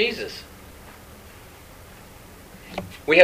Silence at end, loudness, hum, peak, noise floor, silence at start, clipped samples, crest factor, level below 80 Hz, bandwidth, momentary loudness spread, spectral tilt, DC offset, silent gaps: 0 s; -27 LUFS; none; 0 dBFS; -45 dBFS; 0 s; under 0.1%; 24 dB; -52 dBFS; 15.5 kHz; 17 LU; -4 dB/octave; under 0.1%; none